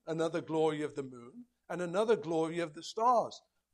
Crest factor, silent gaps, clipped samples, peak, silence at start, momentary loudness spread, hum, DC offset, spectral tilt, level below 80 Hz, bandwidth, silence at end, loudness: 16 dB; none; under 0.1%; -18 dBFS; 0.05 s; 17 LU; none; under 0.1%; -5.5 dB/octave; -80 dBFS; 11 kHz; 0.35 s; -33 LUFS